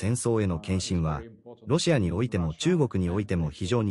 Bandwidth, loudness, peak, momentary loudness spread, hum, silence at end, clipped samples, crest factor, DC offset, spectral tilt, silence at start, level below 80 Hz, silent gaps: 11.5 kHz; -27 LUFS; -10 dBFS; 6 LU; none; 0 s; under 0.1%; 16 dB; under 0.1%; -6 dB/octave; 0 s; -44 dBFS; none